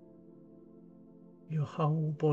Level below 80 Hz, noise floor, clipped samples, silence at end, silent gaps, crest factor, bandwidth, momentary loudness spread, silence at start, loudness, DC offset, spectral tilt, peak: -78 dBFS; -56 dBFS; under 0.1%; 0 s; none; 16 dB; 7 kHz; 25 LU; 0.3 s; -33 LUFS; under 0.1%; -9.5 dB/octave; -18 dBFS